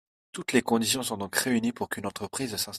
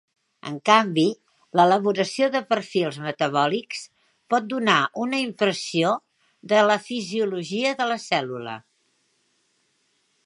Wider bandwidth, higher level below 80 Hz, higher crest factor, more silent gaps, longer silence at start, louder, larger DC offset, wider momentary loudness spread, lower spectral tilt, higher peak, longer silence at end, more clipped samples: first, 15.5 kHz vs 11.5 kHz; first, -66 dBFS vs -76 dBFS; about the same, 22 dB vs 22 dB; neither; about the same, 0.35 s vs 0.45 s; second, -28 LUFS vs -22 LUFS; neither; second, 9 LU vs 13 LU; second, -3 dB/octave vs -4.5 dB/octave; second, -8 dBFS vs -2 dBFS; second, 0 s vs 1.65 s; neither